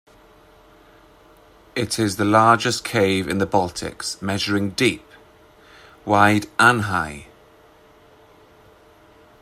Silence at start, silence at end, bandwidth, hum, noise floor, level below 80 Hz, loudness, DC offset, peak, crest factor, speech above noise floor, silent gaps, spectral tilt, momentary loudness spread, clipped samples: 1.75 s; 2.2 s; 16 kHz; none; -51 dBFS; -54 dBFS; -19 LUFS; under 0.1%; 0 dBFS; 22 dB; 32 dB; none; -4.5 dB/octave; 12 LU; under 0.1%